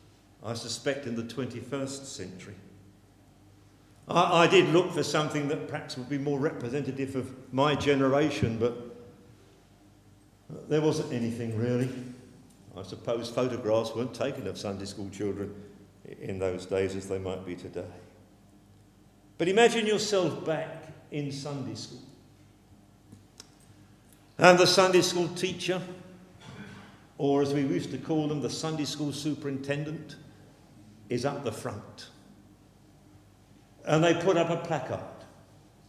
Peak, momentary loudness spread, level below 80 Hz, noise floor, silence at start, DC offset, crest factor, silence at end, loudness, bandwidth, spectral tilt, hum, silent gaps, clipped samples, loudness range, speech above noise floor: -2 dBFS; 23 LU; -60 dBFS; -58 dBFS; 0.4 s; under 0.1%; 30 dB; 0.6 s; -28 LUFS; 14.5 kHz; -5 dB/octave; none; none; under 0.1%; 11 LU; 30 dB